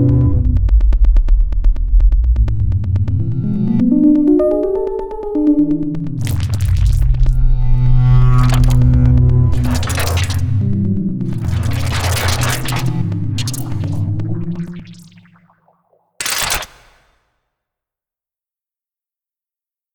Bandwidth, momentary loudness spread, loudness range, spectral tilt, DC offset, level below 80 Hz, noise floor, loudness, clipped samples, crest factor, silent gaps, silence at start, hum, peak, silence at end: over 20 kHz; 9 LU; 11 LU; -6.5 dB/octave; under 0.1%; -18 dBFS; under -90 dBFS; -16 LUFS; under 0.1%; 12 dB; none; 0 s; none; -2 dBFS; 3.25 s